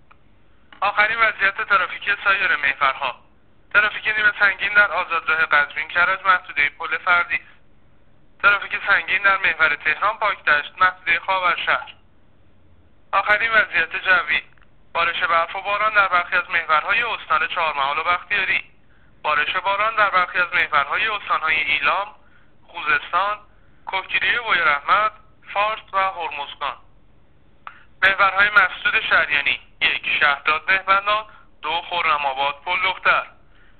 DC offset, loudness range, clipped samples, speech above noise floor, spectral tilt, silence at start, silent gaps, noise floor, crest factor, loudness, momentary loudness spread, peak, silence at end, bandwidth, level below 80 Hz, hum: 0.4%; 3 LU; under 0.1%; 37 dB; 2 dB/octave; 0.8 s; none; -56 dBFS; 18 dB; -19 LUFS; 8 LU; -4 dBFS; 0.5 s; 4.7 kHz; -54 dBFS; none